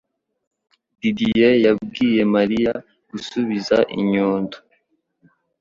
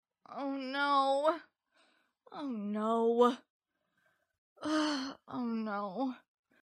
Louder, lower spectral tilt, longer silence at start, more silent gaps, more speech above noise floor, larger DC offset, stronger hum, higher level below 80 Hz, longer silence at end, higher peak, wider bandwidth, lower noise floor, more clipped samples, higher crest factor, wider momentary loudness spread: first, -19 LUFS vs -34 LUFS; first, -6.5 dB/octave vs -5 dB/octave; first, 1.05 s vs 0.3 s; second, none vs 3.50-3.60 s, 4.38-4.56 s; about the same, 48 dB vs 45 dB; neither; neither; first, -54 dBFS vs -86 dBFS; first, 1 s vs 0.45 s; first, -4 dBFS vs -14 dBFS; second, 7.4 kHz vs 12 kHz; second, -66 dBFS vs -78 dBFS; neither; about the same, 18 dB vs 20 dB; about the same, 14 LU vs 15 LU